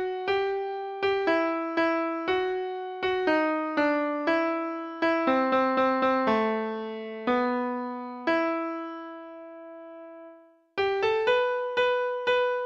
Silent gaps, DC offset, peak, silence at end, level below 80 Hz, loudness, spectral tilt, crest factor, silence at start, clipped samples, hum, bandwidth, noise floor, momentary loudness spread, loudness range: none; under 0.1%; -12 dBFS; 0 s; -66 dBFS; -27 LUFS; -5.5 dB/octave; 16 dB; 0 s; under 0.1%; none; 7.4 kHz; -53 dBFS; 16 LU; 5 LU